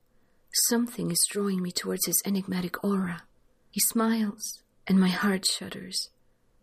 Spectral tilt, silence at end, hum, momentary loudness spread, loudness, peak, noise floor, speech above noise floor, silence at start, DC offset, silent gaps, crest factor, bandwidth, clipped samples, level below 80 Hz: -3.5 dB/octave; 0.55 s; none; 12 LU; -27 LUFS; -10 dBFS; -63 dBFS; 36 dB; 0.55 s; under 0.1%; none; 18 dB; 15.5 kHz; under 0.1%; -66 dBFS